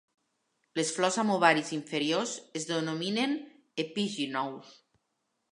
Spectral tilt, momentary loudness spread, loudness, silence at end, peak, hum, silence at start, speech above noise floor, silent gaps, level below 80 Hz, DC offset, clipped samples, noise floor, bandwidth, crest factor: -3.5 dB/octave; 13 LU; -30 LUFS; 0.85 s; -8 dBFS; none; 0.75 s; 50 dB; none; -84 dBFS; under 0.1%; under 0.1%; -80 dBFS; 11.5 kHz; 24 dB